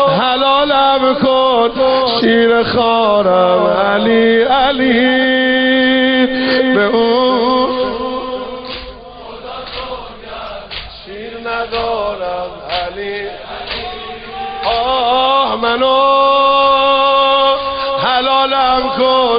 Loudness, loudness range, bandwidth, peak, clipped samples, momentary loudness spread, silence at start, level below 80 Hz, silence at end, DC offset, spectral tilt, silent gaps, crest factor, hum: -12 LUFS; 11 LU; 5.4 kHz; -2 dBFS; under 0.1%; 16 LU; 0 s; -42 dBFS; 0 s; under 0.1%; -9.5 dB/octave; none; 12 dB; none